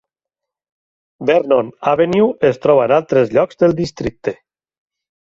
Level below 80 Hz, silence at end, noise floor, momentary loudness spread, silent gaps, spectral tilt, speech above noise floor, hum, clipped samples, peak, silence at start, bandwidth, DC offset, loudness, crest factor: -48 dBFS; 0.85 s; -84 dBFS; 10 LU; none; -7 dB/octave; 69 dB; none; under 0.1%; -2 dBFS; 1.2 s; 7.6 kHz; under 0.1%; -15 LUFS; 14 dB